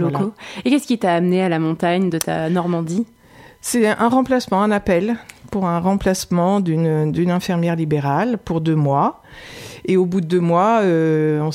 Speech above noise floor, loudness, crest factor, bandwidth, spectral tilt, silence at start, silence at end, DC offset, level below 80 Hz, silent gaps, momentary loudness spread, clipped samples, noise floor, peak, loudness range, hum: 28 dB; -18 LUFS; 16 dB; 16 kHz; -6.5 dB/octave; 0 s; 0 s; under 0.1%; -48 dBFS; none; 9 LU; under 0.1%; -45 dBFS; -2 dBFS; 1 LU; none